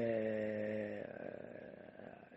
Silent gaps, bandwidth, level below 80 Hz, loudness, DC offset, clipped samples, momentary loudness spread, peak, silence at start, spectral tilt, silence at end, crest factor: none; 7.8 kHz; -78 dBFS; -42 LUFS; under 0.1%; under 0.1%; 16 LU; -26 dBFS; 0 s; -6.5 dB/octave; 0 s; 16 dB